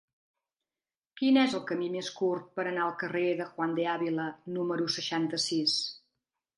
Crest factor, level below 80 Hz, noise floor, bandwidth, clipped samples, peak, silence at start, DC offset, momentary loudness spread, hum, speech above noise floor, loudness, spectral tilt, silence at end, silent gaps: 20 dB; -82 dBFS; under -90 dBFS; 11.5 kHz; under 0.1%; -12 dBFS; 1.15 s; under 0.1%; 8 LU; none; over 60 dB; -30 LUFS; -4 dB/octave; 0.6 s; none